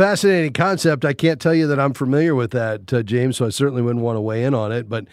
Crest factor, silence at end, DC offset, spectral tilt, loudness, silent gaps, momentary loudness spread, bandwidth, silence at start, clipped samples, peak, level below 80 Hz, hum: 16 dB; 0.05 s; under 0.1%; -6 dB/octave; -19 LUFS; none; 5 LU; 15.5 kHz; 0 s; under 0.1%; -2 dBFS; -58 dBFS; none